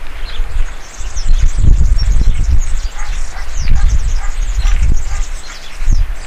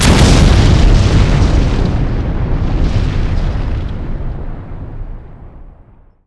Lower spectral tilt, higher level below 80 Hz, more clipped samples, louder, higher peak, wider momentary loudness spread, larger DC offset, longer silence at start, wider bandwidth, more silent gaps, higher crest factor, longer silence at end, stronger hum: second, -4.5 dB/octave vs -6 dB/octave; about the same, -12 dBFS vs -14 dBFS; first, 1% vs 0.3%; second, -19 LUFS vs -13 LUFS; about the same, 0 dBFS vs 0 dBFS; second, 12 LU vs 20 LU; neither; about the same, 0 s vs 0 s; second, 8.8 kHz vs 11 kHz; neither; about the same, 10 dB vs 12 dB; second, 0 s vs 0.55 s; neither